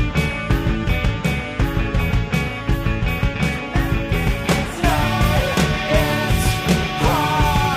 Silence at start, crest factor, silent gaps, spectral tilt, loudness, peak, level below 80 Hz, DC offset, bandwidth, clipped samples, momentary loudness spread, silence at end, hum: 0 s; 16 dB; none; -5.5 dB/octave; -19 LUFS; -4 dBFS; -24 dBFS; under 0.1%; 15.5 kHz; under 0.1%; 4 LU; 0 s; none